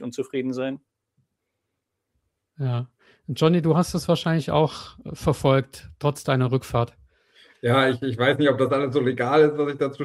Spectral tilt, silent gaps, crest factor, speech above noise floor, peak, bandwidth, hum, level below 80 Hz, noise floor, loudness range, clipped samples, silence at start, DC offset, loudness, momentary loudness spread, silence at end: -6.5 dB/octave; none; 18 dB; 58 dB; -4 dBFS; 14.5 kHz; none; -52 dBFS; -80 dBFS; 6 LU; under 0.1%; 0 s; under 0.1%; -23 LUFS; 12 LU; 0 s